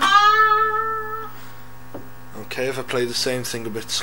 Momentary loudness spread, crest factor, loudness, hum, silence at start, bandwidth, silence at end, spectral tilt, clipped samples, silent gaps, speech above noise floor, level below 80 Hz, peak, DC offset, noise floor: 25 LU; 20 dB; -19 LUFS; none; 0 s; 17.5 kHz; 0 s; -2.5 dB/octave; under 0.1%; none; 17 dB; -54 dBFS; -2 dBFS; 2%; -42 dBFS